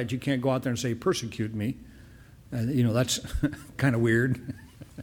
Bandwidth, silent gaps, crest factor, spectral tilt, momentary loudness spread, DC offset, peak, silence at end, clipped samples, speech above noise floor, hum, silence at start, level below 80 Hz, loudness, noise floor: 18 kHz; none; 16 dB; -5.5 dB/octave; 12 LU; under 0.1%; -12 dBFS; 0 s; under 0.1%; 23 dB; none; 0 s; -46 dBFS; -28 LUFS; -50 dBFS